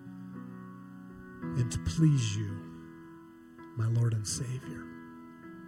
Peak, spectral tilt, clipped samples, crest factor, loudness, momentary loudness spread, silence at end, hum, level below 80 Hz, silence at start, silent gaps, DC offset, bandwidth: -14 dBFS; -6 dB/octave; under 0.1%; 18 dB; -32 LUFS; 22 LU; 0 s; none; -54 dBFS; 0 s; none; under 0.1%; 14 kHz